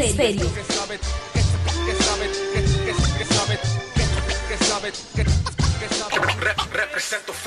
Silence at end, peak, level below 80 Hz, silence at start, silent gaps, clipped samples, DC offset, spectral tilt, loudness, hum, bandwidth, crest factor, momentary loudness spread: 0 s; -8 dBFS; -28 dBFS; 0 s; none; under 0.1%; under 0.1%; -4 dB/octave; -22 LUFS; none; 13 kHz; 14 dB; 5 LU